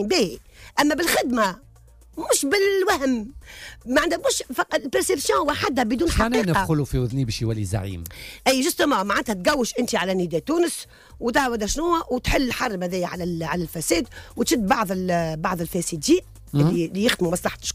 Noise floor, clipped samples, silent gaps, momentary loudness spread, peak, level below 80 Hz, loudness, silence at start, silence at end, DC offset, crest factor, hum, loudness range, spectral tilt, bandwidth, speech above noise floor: -49 dBFS; under 0.1%; none; 8 LU; -6 dBFS; -40 dBFS; -22 LUFS; 0 s; 0 s; under 0.1%; 16 dB; none; 2 LU; -4 dB/octave; 16 kHz; 27 dB